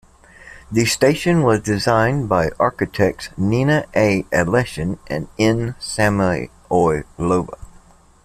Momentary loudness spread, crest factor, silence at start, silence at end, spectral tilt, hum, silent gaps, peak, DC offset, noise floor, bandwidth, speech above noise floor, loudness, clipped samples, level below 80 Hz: 8 LU; 16 dB; 0.45 s; 0.6 s; -5.5 dB/octave; none; none; -2 dBFS; under 0.1%; -48 dBFS; 15 kHz; 30 dB; -18 LUFS; under 0.1%; -42 dBFS